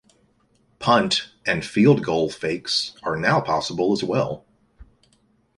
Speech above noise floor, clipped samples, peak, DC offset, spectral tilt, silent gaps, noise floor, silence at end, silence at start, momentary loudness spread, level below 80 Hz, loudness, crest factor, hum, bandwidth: 42 dB; under 0.1%; -4 dBFS; under 0.1%; -5 dB/octave; none; -63 dBFS; 0.75 s; 0.8 s; 10 LU; -54 dBFS; -21 LUFS; 20 dB; none; 11.5 kHz